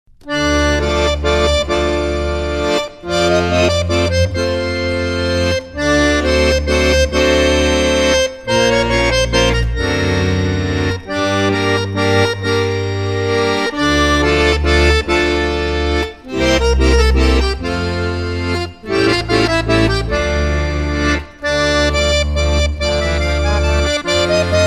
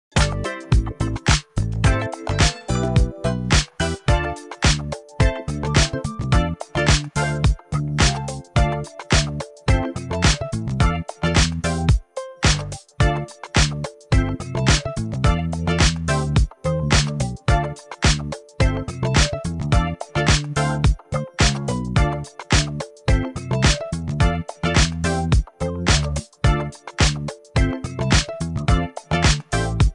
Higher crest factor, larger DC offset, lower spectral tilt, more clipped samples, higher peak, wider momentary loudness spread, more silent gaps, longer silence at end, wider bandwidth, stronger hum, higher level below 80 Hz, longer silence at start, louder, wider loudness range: second, 14 dB vs 20 dB; second, under 0.1% vs 0.1%; about the same, -5 dB/octave vs -4.5 dB/octave; neither; about the same, 0 dBFS vs 0 dBFS; about the same, 6 LU vs 7 LU; neither; about the same, 0 s vs 0 s; first, 13.5 kHz vs 11.5 kHz; neither; about the same, -22 dBFS vs -26 dBFS; about the same, 0.25 s vs 0.15 s; first, -15 LUFS vs -21 LUFS; about the same, 3 LU vs 1 LU